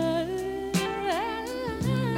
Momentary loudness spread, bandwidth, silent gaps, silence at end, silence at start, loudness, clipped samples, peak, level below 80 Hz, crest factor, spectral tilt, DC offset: 4 LU; 16.5 kHz; none; 0 s; 0 s; -29 LUFS; under 0.1%; -14 dBFS; -50 dBFS; 14 dB; -5.5 dB/octave; under 0.1%